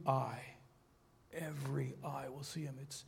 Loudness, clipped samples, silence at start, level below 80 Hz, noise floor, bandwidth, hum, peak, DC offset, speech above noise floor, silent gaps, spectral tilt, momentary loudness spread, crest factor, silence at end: -43 LUFS; under 0.1%; 0 s; -74 dBFS; -69 dBFS; 16.5 kHz; none; -22 dBFS; under 0.1%; 28 dB; none; -6 dB/octave; 13 LU; 22 dB; 0 s